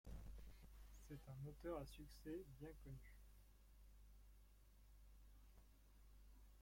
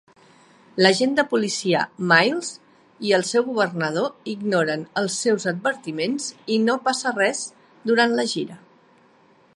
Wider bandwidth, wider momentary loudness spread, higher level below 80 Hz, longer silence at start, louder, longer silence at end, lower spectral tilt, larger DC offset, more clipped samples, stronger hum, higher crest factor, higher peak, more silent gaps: first, 16.5 kHz vs 11.5 kHz; first, 16 LU vs 12 LU; first, -64 dBFS vs -74 dBFS; second, 0.05 s vs 0.75 s; second, -58 LUFS vs -22 LUFS; second, 0 s vs 1 s; first, -6.5 dB/octave vs -3.5 dB/octave; neither; neither; neither; about the same, 18 dB vs 22 dB; second, -40 dBFS vs 0 dBFS; neither